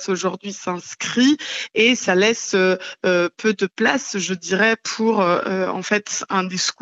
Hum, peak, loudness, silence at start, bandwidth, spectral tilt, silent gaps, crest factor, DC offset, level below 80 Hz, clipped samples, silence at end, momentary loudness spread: none; -2 dBFS; -19 LUFS; 0 s; 8.2 kHz; -3.5 dB/octave; none; 18 dB; under 0.1%; -72 dBFS; under 0.1%; 0.1 s; 7 LU